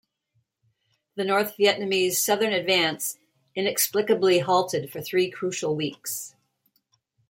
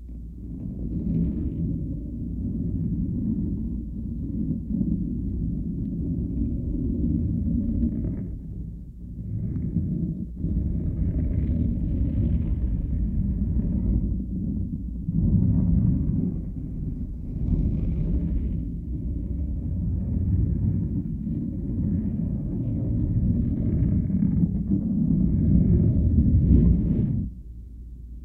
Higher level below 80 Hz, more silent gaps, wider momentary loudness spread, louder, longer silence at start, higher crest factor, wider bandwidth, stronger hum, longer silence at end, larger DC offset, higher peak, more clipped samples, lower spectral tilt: second, -74 dBFS vs -30 dBFS; neither; about the same, 11 LU vs 11 LU; about the same, -24 LUFS vs -26 LUFS; first, 1.15 s vs 0 s; about the same, 18 dB vs 18 dB; first, 16.5 kHz vs 2.4 kHz; neither; first, 1 s vs 0 s; neither; about the same, -8 dBFS vs -6 dBFS; neither; second, -3 dB/octave vs -13.5 dB/octave